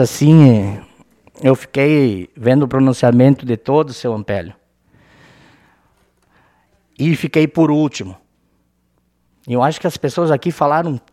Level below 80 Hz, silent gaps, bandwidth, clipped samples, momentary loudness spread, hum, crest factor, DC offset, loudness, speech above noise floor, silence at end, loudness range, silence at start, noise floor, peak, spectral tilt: -54 dBFS; none; 14 kHz; under 0.1%; 12 LU; none; 16 dB; under 0.1%; -15 LUFS; 48 dB; 0.15 s; 10 LU; 0 s; -62 dBFS; 0 dBFS; -7.5 dB/octave